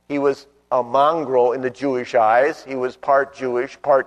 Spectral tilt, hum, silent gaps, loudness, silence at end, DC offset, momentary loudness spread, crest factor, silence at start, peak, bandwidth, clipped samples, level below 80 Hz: -6 dB/octave; none; none; -19 LUFS; 0 s; under 0.1%; 8 LU; 14 dB; 0.1 s; -4 dBFS; 10.5 kHz; under 0.1%; -64 dBFS